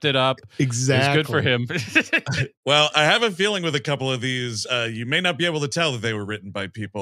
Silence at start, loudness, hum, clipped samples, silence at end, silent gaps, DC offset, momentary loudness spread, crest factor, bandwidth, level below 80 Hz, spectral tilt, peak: 0 s; -21 LUFS; none; under 0.1%; 0 s; 2.57-2.63 s; under 0.1%; 9 LU; 20 dB; 14 kHz; -64 dBFS; -4 dB/octave; -2 dBFS